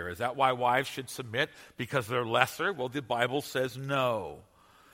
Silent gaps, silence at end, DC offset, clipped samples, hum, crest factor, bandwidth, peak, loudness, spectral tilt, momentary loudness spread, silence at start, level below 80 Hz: none; 0.55 s; under 0.1%; under 0.1%; none; 26 dB; 16.5 kHz; -4 dBFS; -30 LUFS; -4.5 dB/octave; 9 LU; 0 s; -66 dBFS